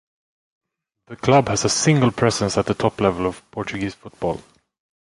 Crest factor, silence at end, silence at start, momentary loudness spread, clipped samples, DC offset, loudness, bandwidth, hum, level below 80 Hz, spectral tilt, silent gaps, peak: 20 dB; 0.65 s; 1.1 s; 12 LU; under 0.1%; under 0.1%; -20 LUFS; 11.5 kHz; none; -48 dBFS; -5 dB/octave; none; -2 dBFS